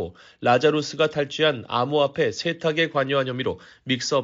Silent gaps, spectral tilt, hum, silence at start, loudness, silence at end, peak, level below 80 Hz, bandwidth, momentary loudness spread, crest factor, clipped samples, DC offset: none; -3 dB/octave; none; 0 s; -23 LUFS; 0 s; -6 dBFS; -60 dBFS; 7.8 kHz; 8 LU; 18 dB; under 0.1%; under 0.1%